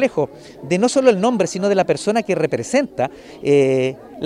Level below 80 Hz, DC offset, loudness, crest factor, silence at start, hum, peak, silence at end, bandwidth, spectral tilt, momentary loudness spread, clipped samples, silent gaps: -58 dBFS; under 0.1%; -18 LUFS; 16 dB; 0 s; none; -2 dBFS; 0 s; 12 kHz; -5.5 dB/octave; 10 LU; under 0.1%; none